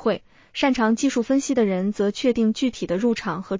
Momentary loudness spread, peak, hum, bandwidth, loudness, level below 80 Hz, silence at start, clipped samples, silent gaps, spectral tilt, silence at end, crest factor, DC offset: 6 LU; -8 dBFS; none; 7.6 kHz; -22 LUFS; -54 dBFS; 0 s; under 0.1%; none; -5 dB/octave; 0 s; 14 dB; under 0.1%